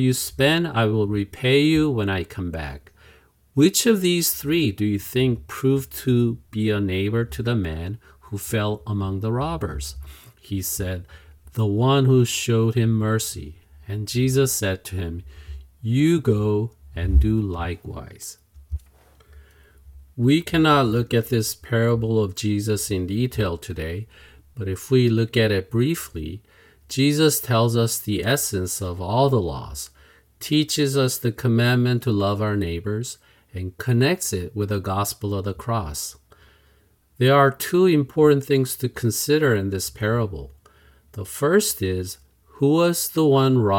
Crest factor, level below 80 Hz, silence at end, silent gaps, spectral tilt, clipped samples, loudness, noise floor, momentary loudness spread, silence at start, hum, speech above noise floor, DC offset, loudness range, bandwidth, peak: 18 dB; -38 dBFS; 0 s; none; -5.5 dB/octave; under 0.1%; -22 LUFS; -59 dBFS; 16 LU; 0 s; none; 38 dB; under 0.1%; 5 LU; 18 kHz; -4 dBFS